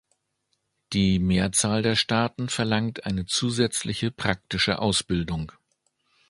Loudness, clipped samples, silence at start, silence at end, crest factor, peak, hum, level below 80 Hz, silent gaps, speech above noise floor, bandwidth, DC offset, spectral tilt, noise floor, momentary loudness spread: -24 LUFS; under 0.1%; 0.9 s; 0.8 s; 22 dB; -4 dBFS; none; -46 dBFS; none; 51 dB; 11.5 kHz; under 0.1%; -4 dB/octave; -75 dBFS; 7 LU